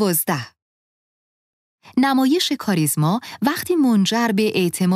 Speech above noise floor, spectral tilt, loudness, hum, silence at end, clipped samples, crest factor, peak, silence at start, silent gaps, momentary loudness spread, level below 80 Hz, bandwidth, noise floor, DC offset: over 72 dB; -4.5 dB/octave; -19 LUFS; none; 0 s; under 0.1%; 16 dB; -4 dBFS; 0 s; 0.62-1.78 s; 7 LU; -64 dBFS; 16 kHz; under -90 dBFS; under 0.1%